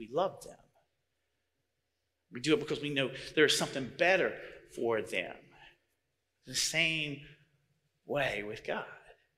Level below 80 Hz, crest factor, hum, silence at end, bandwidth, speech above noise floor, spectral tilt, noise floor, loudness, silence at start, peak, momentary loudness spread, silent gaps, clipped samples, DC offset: -68 dBFS; 22 dB; none; 0.25 s; 16 kHz; 51 dB; -3 dB/octave; -84 dBFS; -32 LUFS; 0 s; -12 dBFS; 20 LU; none; under 0.1%; under 0.1%